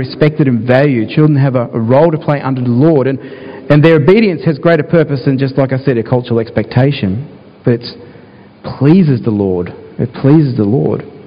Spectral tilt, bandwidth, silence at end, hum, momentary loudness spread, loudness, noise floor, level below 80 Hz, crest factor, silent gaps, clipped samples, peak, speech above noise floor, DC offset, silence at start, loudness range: -10.5 dB/octave; 5.2 kHz; 0.05 s; none; 11 LU; -11 LUFS; -37 dBFS; -44 dBFS; 12 dB; none; 0.6%; 0 dBFS; 27 dB; under 0.1%; 0 s; 4 LU